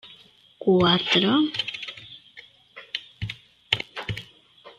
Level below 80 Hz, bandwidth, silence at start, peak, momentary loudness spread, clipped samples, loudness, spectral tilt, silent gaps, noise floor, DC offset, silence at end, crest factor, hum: -56 dBFS; 11.5 kHz; 0.05 s; -2 dBFS; 21 LU; under 0.1%; -24 LUFS; -5.5 dB/octave; none; -53 dBFS; under 0.1%; 0.1 s; 24 dB; none